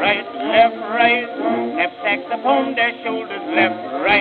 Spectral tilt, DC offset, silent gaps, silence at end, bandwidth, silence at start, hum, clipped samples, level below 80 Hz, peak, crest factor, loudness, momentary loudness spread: -7 dB/octave; under 0.1%; none; 0 s; 4.7 kHz; 0 s; none; under 0.1%; -64 dBFS; -2 dBFS; 16 dB; -18 LUFS; 6 LU